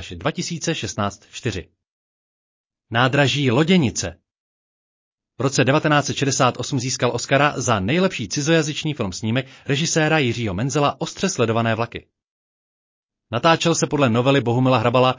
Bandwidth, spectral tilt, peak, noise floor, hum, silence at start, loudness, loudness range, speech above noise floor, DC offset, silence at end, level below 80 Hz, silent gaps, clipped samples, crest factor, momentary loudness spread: 7.8 kHz; -4.5 dB/octave; -4 dBFS; under -90 dBFS; none; 0 s; -20 LUFS; 3 LU; over 70 dB; under 0.1%; 0 s; -48 dBFS; 1.91-2.70 s, 4.40-5.18 s, 12.30-13.09 s; under 0.1%; 16 dB; 9 LU